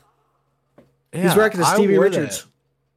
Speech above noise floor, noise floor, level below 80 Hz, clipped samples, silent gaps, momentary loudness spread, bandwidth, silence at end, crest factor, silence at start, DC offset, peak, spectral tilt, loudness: 50 dB; -67 dBFS; -64 dBFS; under 0.1%; none; 14 LU; 16 kHz; 0.55 s; 16 dB; 1.15 s; under 0.1%; -4 dBFS; -5 dB/octave; -17 LUFS